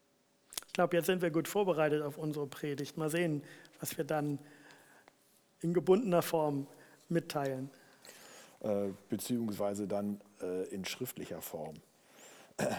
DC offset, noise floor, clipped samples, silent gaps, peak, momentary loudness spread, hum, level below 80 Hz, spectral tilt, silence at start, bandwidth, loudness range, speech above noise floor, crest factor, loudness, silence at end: under 0.1%; -72 dBFS; under 0.1%; none; -12 dBFS; 19 LU; none; -78 dBFS; -5.5 dB/octave; 0.5 s; over 20 kHz; 5 LU; 37 dB; 24 dB; -35 LUFS; 0 s